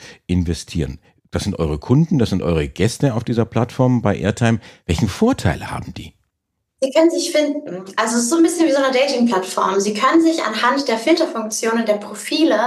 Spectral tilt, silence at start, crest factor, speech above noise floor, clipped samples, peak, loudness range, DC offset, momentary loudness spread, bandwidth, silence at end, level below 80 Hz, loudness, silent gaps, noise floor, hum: -5.5 dB/octave; 0 s; 16 dB; 58 dB; under 0.1%; 0 dBFS; 4 LU; under 0.1%; 9 LU; 13.5 kHz; 0 s; -40 dBFS; -18 LUFS; none; -75 dBFS; none